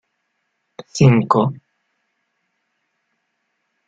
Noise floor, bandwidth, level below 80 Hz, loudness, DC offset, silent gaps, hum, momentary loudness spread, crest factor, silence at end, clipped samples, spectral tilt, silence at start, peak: -72 dBFS; 7.8 kHz; -54 dBFS; -16 LUFS; under 0.1%; none; none; 19 LU; 20 dB; 2.3 s; under 0.1%; -7 dB/octave; 0.95 s; -2 dBFS